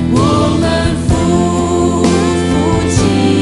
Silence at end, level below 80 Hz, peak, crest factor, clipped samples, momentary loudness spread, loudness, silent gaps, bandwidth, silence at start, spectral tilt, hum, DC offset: 0 s; -26 dBFS; 0 dBFS; 10 dB; under 0.1%; 2 LU; -12 LUFS; none; 11.5 kHz; 0 s; -6 dB/octave; none; under 0.1%